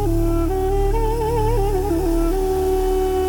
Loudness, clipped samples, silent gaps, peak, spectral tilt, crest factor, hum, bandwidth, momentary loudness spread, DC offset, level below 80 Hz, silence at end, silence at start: -20 LUFS; under 0.1%; none; -8 dBFS; -7 dB/octave; 10 dB; none; 18 kHz; 1 LU; under 0.1%; -22 dBFS; 0 s; 0 s